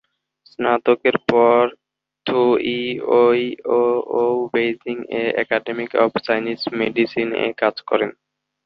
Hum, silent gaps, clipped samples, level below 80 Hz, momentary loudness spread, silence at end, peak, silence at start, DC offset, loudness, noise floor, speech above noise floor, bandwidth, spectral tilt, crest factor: none; none; under 0.1%; -62 dBFS; 8 LU; 0.55 s; -2 dBFS; 0.6 s; under 0.1%; -19 LUFS; -57 dBFS; 39 dB; 5.8 kHz; -7.5 dB/octave; 18 dB